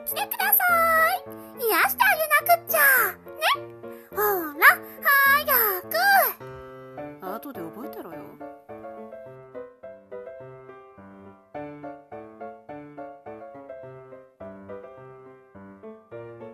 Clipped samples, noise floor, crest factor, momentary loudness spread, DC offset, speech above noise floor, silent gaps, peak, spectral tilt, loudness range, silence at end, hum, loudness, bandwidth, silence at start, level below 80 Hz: under 0.1%; -48 dBFS; 22 dB; 25 LU; under 0.1%; 26 dB; none; -4 dBFS; -1.5 dB/octave; 22 LU; 0 s; none; -20 LUFS; 14.5 kHz; 0 s; -64 dBFS